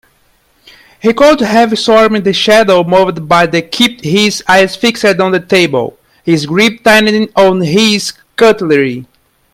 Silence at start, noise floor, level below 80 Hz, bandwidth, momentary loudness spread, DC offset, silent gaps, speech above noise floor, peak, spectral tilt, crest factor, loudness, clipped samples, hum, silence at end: 1.05 s; -52 dBFS; -46 dBFS; 16.5 kHz; 7 LU; under 0.1%; none; 44 dB; 0 dBFS; -4.5 dB/octave; 10 dB; -9 LUFS; 0.3%; none; 0.5 s